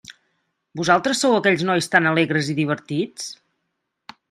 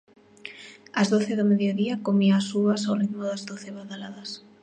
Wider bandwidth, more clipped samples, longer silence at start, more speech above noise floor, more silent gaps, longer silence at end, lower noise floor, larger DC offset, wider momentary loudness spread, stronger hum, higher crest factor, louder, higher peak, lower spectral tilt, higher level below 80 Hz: first, 14 kHz vs 9.4 kHz; neither; second, 0.1 s vs 0.45 s; first, 57 dB vs 21 dB; neither; first, 0.95 s vs 0.25 s; first, -76 dBFS vs -45 dBFS; neither; second, 12 LU vs 18 LU; neither; first, 22 dB vs 16 dB; first, -19 LUFS vs -24 LUFS; first, 0 dBFS vs -10 dBFS; second, -4.5 dB/octave vs -6 dB/octave; first, -64 dBFS vs -74 dBFS